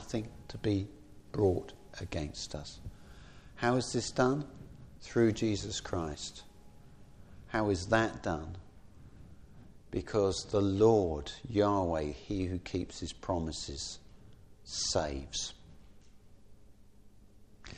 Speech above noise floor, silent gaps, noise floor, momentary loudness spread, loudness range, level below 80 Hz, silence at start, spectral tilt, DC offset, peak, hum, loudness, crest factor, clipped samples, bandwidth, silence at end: 24 dB; none; -56 dBFS; 18 LU; 6 LU; -52 dBFS; 0 s; -5 dB/octave; under 0.1%; -12 dBFS; none; -33 LUFS; 22 dB; under 0.1%; 11 kHz; 0 s